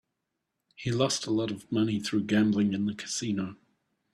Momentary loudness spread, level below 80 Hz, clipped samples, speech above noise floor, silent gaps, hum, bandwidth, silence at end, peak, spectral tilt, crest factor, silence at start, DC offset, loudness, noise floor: 7 LU; -64 dBFS; under 0.1%; 55 dB; none; none; 13 kHz; 0.6 s; -12 dBFS; -5 dB/octave; 18 dB; 0.8 s; under 0.1%; -29 LUFS; -83 dBFS